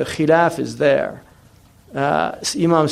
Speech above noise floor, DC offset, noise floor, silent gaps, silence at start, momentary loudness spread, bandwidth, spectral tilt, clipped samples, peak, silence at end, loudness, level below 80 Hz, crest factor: 32 dB; under 0.1%; -49 dBFS; none; 0 s; 8 LU; 14.5 kHz; -5 dB/octave; under 0.1%; -2 dBFS; 0 s; -18 LUFS; -54 dBFS; 16 dB